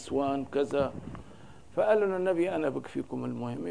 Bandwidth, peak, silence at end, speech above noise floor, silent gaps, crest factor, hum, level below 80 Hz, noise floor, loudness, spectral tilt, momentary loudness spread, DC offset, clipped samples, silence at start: 10.5 kHz; -12 dBFS; 0 s; 22 dB; none; 18 dB; none; -58 dBFS; -52 dBFS; -30 LUFS; -7 dB/octave; 11 LU; 0.3%; under 0.1%; 0 s